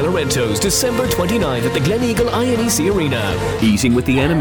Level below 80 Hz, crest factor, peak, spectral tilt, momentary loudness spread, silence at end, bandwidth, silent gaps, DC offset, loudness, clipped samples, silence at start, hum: -34 dBFS; 12 dB; -4 dBFS; -4.5 dB/octave; 2 LU; 0 s; 19.5 kHz; none; under 0.1%; -16 LUFS; under 0.1%; 0 s; none